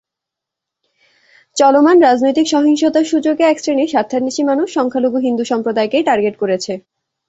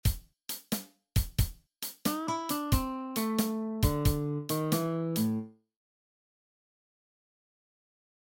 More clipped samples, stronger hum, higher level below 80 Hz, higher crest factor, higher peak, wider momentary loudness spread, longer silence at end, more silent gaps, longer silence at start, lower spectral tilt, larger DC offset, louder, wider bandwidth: neither; neither; second, -60 dBFS vs -40 dBFS; second, 14 dB vs 20 dB; first, 0 dBFS vs -14 dBFS; about the same, 8 LU vs 9 LU; second, 0.5 s vs 2.85 s; neither; first, 1.55 s vs 0.05 s; second, -4 dB/octave vs -5.5 dB/octave; neither; first, -14 LUFS vs -32 LUFS; second, 8 kHz vs 17 kHz